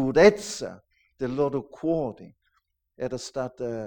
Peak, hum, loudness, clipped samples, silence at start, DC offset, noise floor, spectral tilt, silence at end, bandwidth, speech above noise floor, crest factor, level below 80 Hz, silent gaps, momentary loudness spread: -4 dBFS; none; -26 LUFS; under 0.1%; 0 s; under 0.1%; -73 dBFS; -5 dB/octave; 0 s; 18.5 kHz; 48 dB; 22 dB; -54 dBFS; none; 17 LU